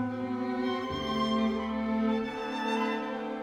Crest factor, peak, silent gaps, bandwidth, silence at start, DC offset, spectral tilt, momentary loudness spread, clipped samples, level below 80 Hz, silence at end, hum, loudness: 14 dB; -18 dBFS; none; 9.6 kHz; 0 s; under 0.1%; -6 dB/octave; 5 LU; under 0.1%; -56 dBFS; 0 s; none; -31 LUFS